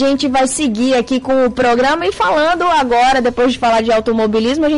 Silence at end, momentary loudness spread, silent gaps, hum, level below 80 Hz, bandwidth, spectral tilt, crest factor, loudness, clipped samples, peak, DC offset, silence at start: 0 s; 3 LU; none; none; -40 dBFS; 11.5 kHz; -3.5 dB/octave; 6 dB; -13 LUFS; under 0.1%; -6 dBFS; 0.6%; 0 s